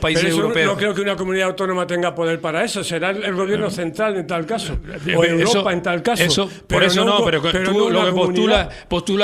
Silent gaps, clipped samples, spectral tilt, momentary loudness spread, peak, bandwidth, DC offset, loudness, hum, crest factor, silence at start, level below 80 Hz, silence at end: none; under 0.1%; -4.5 dB/octave; 7 LU; 0 dBFS; 15.5 kHz; under 0.1%; -18 LUFS; none; 18 dB; 0 s; -40 dBFS; 0 s